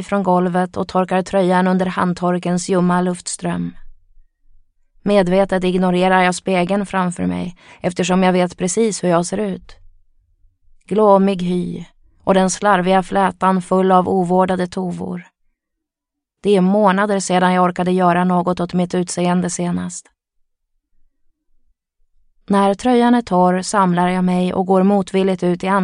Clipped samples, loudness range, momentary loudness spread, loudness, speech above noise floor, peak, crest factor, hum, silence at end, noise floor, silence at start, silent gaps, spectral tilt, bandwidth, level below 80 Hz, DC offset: under 0.1%; 5 LU; 10 LU; -17 LUFS; 66 dB; 0 dBFS; 16 dB; none; 0 s; -82 dBFS; 0 s; none; -6 dB/octave; 11 kHz; -48 dBFS; under 0.1%